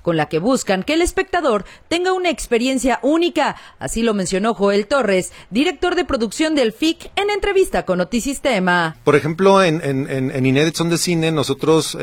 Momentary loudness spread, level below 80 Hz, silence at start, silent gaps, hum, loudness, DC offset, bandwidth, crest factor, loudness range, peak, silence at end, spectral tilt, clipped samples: 5 LU; -40 dBFS; 0.05 s; none; none; -18 LUFS; under 0.1%; 17.5 kHz; 18 dB; 2 LU; 0 dBFS; 0 s; -4.5 dB/octave; under 0.1%